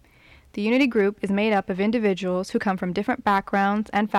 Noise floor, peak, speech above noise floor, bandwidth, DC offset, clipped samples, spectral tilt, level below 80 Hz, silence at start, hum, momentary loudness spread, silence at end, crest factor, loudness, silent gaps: -53 dBFS; -10 dBFS; 30 dB; 12.5 kHz; under 0.1%; under 0.1%; -6.5 dB/octave; -56 dBFS; 0.55 s; none; 5 LU; 0 s; 14 dB; -23 LUFS; none